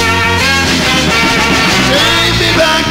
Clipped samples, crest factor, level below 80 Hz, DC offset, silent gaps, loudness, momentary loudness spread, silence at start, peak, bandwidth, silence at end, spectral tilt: under 0.1%; 10 dB; -28 dBFS; under 0.1%; none; -8 LUFS; 1 LU; 0 s; 0 dBFS; 16.5 kHz; 0 s; -3 dB/octave